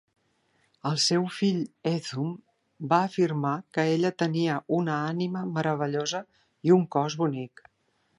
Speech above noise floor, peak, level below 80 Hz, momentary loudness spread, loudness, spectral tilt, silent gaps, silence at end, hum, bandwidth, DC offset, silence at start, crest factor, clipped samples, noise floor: 45 dB; -8 dBFS; -74 dBFS; 10 LU; -27 LUFS; -5.5 dB/octave; none; 0.7 s; none; 11.5 kHz; under 0.1%; 0.85 s; 18 dB; under 0.1%; -71 dBFS